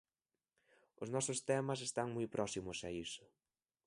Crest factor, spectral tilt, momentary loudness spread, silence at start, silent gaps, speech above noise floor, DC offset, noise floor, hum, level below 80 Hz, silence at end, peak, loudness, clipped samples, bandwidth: 20 dB; -4 dB/octave; 10 LU; 1 s; none; over 49 dB; under 0.1%; under -90 dBFS; none; -70 dBFS; 0.6 s; -22 dBFS; -41 LUFS; under 0.1%; 11.5 kHz